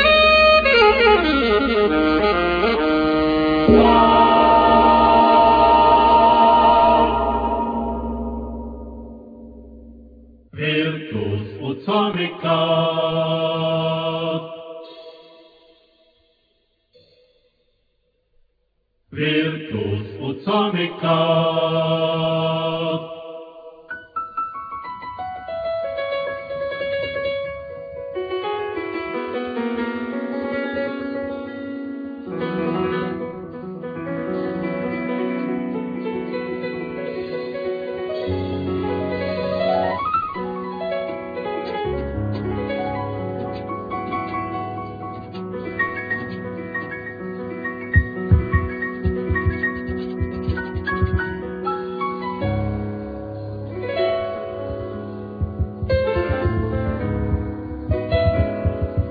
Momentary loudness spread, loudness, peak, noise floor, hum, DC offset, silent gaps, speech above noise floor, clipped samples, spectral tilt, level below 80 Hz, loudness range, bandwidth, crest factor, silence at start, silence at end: 18 LU; -20 LUFS; -2 dBFS; -68 dBFS; none; under 0.1%; none; 49 dB; under 0.1%; -8.5 dB/octave; -36 dBFS; 13 LU; 5 kHz; 20 dB; 0 s; 0 s